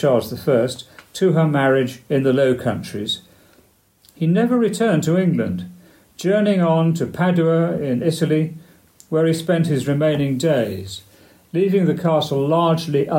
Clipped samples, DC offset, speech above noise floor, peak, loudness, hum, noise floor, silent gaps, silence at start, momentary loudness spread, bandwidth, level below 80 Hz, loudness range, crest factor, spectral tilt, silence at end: under 0.1%; under 0.1%; 38 dB; -4 dBFS; -19 LUFS; none; -56 dBFS; none; 0 s; 9 LU; 16.5 kHz; -58 dBFS; 2 LU; 14 dB; -7 dB/octave; 0 s